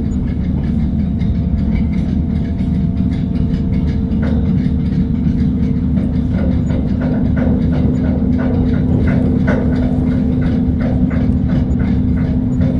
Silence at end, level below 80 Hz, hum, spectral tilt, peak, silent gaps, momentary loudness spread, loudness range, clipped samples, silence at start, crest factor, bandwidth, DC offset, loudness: 0 s; -22 dBFS; none; -10 dB/octave; -2 dBFS; none; 3 LU; 2 LU; under 0.1%; 0 s; 12 dB; 7.2 kHz; under 0.1%; -16 LUFS